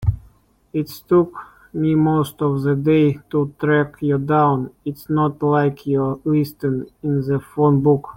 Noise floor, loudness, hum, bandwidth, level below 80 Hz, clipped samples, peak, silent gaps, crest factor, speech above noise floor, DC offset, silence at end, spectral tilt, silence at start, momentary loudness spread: -53 dBFS; -19 LUFS; none; 17 kHz; -44 dBFS; under 0.1%; -4 dBFS; none; 14 dB; 34 dB; under 0.1%; 0.05 s; -9 dB/octave; 0 s; 10 LU